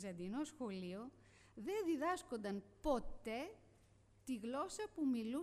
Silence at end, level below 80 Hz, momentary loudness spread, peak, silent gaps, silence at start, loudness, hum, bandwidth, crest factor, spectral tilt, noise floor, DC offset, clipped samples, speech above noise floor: 0 s; -62 dBFS; 12 LU; -26 dBFS; none; 0 s; -44 LUFS; none; 14.5 kHz; 18 dB; -5 dB/octave; -70 dBFS; under 0.1%; under 0.1%; 26 dB